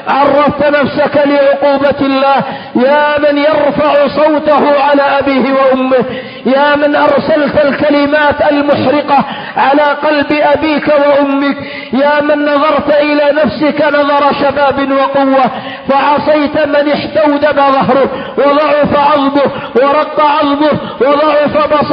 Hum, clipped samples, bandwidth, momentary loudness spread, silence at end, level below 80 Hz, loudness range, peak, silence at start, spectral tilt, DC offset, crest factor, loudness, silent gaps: none; under 0.1%; 5.4 kHz; 4 LU; 0 s; -44 dBFS; 1 LU; 0 dBFS; 0 s; -8.5 dB/octave; under 0.1%; 10 dB; -9 LUFS; none